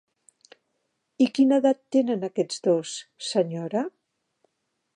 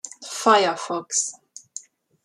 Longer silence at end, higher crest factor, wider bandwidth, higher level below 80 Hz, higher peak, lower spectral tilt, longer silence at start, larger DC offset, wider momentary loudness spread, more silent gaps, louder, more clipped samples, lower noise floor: first, 1.05 s vs 0.45 s; about the same, 18 dB vs 22 dB; second, 10.5 kHz vs 13.5 kHz; about the same, -84 dBFS vs -80 dBFS; second, -8 dBFS vs -2 dBFS; first, -5.5 dB/octave vs -1.5 dB/octave; first, 1.2 s vs 0.05 s; neither; second, 10 LU vs 21 LU; neither; second, -24 LUFS vs -21 LUFS; neither; first, -77 dBFS vs -43 dBFS